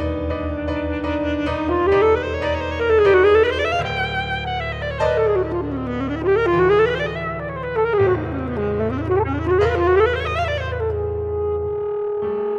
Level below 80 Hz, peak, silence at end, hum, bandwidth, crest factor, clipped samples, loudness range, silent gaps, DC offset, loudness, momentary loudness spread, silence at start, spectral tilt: -34 dBFS; -4 dBFS; 0 s; none; 7.4 kHz; 16 dB; under 0.1%; 3 LU; none; under 0.1%; -20 LUFS; 9 LU; 0 s; -7.5 dB/octave